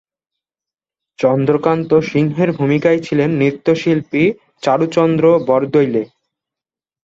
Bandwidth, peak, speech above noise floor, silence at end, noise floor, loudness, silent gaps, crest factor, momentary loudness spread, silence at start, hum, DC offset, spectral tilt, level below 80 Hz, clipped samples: 7.8 kHz; -2 dBFS; 75 dB; 0.95 s; -89 dBFS; -15 LUFS; none; 14 dB; 5 LU; 1.2 s; none; under 0.1%; -7.5 dB/octave; -56 dBFS; under 0.1%